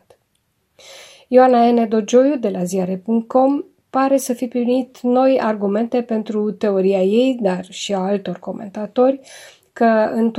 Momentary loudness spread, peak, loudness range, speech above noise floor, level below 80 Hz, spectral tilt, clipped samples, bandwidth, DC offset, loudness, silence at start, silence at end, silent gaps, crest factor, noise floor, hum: 9 LU; 0 dBFS; 3 LU; 50 dB; -70 dBFS; -6 dB/octave; under 0.1%; 15.5 kHz; under 0.1%; -17 LUFS; 0.9 s; 0 s; none; 18 dB; -67 dBFS; none